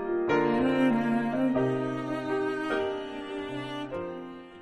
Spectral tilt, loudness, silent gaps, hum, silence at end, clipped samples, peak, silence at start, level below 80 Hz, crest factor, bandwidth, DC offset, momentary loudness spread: -7 dB/octave; -29 LUFS; none; none; 0 s; under 0.1%; -14 dBFS; 0 s; -60 dBFS; 14 dB; 11 kHz; under 0.1%; 11 LU